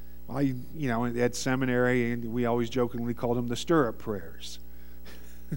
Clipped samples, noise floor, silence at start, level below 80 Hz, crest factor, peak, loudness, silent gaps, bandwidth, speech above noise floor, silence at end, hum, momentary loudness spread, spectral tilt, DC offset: under 0.1%; -48 dBFS; 0 s; -50 dBFS; 18 dB; -12 dBFS; -29 LUFS; none; 16.5 kHz; 20 dB; 0 s; none; 20 LU; -6 dB/octave; 1%